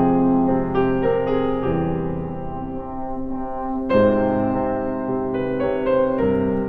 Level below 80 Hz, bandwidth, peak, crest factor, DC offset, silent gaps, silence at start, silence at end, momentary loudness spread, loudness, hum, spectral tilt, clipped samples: -38 dBFS; 4.6 kHz; -4 dBFS; 16 dB; under 0.1%; none; 0 s; 0 s; 11 LU; -21 LUFS; none; -10.5 dB/octave; under 0.1%